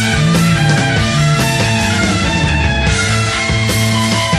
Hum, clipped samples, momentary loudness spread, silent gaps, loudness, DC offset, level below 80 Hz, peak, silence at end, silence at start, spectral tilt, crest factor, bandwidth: none; under 0.1%; 2 LU; none; -13 LUFS; under 0.1%; -26 dBFS; -2 dBFS; 0 s; 0 s; -4.5 dB/octave; 12 dB; 14.5 kHz